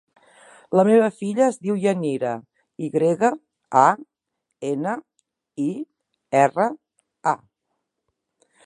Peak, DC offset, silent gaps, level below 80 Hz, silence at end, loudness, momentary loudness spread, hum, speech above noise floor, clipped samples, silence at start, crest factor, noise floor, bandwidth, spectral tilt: -2 dBFS; under 0.1%; none; -74 dBFS; 1.3 s; -22 LUFS; 15 LU; none; 59 dB; under 0.1%; 0.7 s; 22 dB; -79 dBFS; 11.5 kHz; -6.5 dB/octave